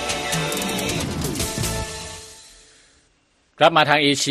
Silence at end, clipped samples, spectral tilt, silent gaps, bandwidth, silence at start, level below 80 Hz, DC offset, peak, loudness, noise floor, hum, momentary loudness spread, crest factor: 0 s; under 0.1%; -3 dB/octave; none; 15 kHz; 0 s; -42 dBFS; under 0.1%; 0 dBFS; -20 LUFS; -62 dBFS; none; 17 LU; 22 dB